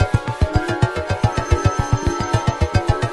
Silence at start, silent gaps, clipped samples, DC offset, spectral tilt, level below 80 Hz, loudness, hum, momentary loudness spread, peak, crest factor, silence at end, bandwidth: 0 s; none; under 0.1%; under 0.1%; -6 dB/octave; -26 dBFS; -20 LUFS; none; 2 LU; -2 dBFS; 16 dB; 0 s; 11.5 kHz